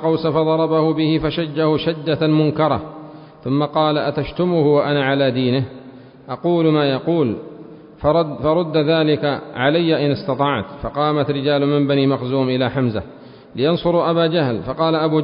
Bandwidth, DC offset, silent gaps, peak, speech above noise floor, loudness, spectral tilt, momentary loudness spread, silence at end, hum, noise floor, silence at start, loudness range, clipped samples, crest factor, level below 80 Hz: 5.4 kHz; under 0.1%; none; -2 dBFS; 22 dB; -18 LUFS; -12 dB/octave; 7 LU; 0 s; none; -40 dBFS; 0 s; 1 LU; under 0.1%; 16 dB; -46 dBFS